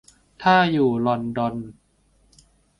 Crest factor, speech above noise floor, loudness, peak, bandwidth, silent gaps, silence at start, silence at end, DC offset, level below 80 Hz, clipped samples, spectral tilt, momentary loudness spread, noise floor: 18 dB; 41 dB; -21 LUFS; -4 dBFS; 11 kHz; none; 0.4 s; 1.05 s; under 0.1%; -56 dBFS; under 0.1%; -7 dB/octave; 14 LU; -61 dBFS